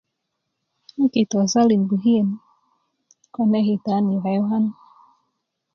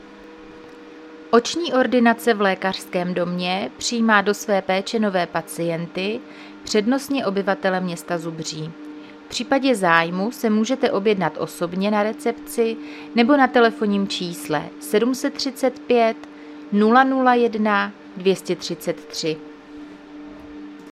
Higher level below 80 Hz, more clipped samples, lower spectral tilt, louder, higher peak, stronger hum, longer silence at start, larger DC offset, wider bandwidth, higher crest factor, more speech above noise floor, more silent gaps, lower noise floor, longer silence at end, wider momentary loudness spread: about the same, -66 dBFS vs -62 dBFS; neither; first, -6.5 dB/octave vs -4.5 dB/octave; about the same, -20 LUFS vs -20 LUFS; second, -6 dBFS vs 0 dBFS; neither; first, 1 s vs 0 s; neither; second, 7 kHz vs 15 kHz; about the same, 16 dB vs 20 dB; first, 59 dB vs 21 dB; neither; first, -78 dBFS vs -41 dBFS; first, 1 s vs 0 s; second, 8 LU vs 22 LU